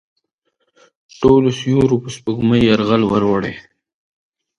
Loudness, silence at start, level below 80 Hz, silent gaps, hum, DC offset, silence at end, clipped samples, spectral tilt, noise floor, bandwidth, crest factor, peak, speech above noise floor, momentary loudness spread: -15 LUFS; 1.2 s; -44 dBFS; none; none; under 0.1%; 1 s; under 0.1%; -7 dB/octave; -69 dBFS; 11 kHz; 16 dB; 0 dBFS; 54 dB; 9 LU